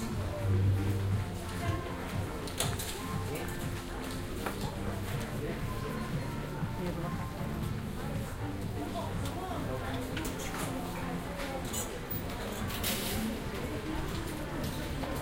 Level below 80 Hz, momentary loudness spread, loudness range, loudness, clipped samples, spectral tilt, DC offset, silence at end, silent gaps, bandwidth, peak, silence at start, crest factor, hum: -44 dBFS; 5 LU; 3 LU; -36 LUFS; under 0.1%; -5 dB/octave; under 0.1%; 0 s; none; 17 kHz; -16 dBFS; 0 s; 20 dB; none